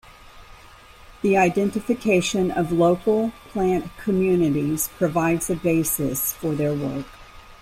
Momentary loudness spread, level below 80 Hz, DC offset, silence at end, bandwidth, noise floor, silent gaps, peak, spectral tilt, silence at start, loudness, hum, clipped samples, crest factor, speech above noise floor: 6 LU; -48 dBFS; under 0.1%; 0.05 s; 16 kHz; -46 dBFS; none; -6 dBFS; -5.5 dB/octave; 0.35 s; -22 LUFS; none; under 0.1%; 16 dB; 25 dB